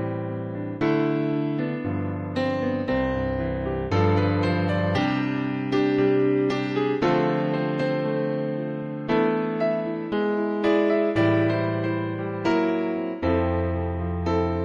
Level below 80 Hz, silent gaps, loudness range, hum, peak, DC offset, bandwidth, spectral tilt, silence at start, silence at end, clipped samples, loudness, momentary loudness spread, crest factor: -44 dBFS; none; 2 LU; none; -10 dBFS; under 0.1%; 7.2 kHz; -8.5 dB/octave; 0 s; 0 s; under 0.1%; -24 LUFS; 7 LU; 14 dB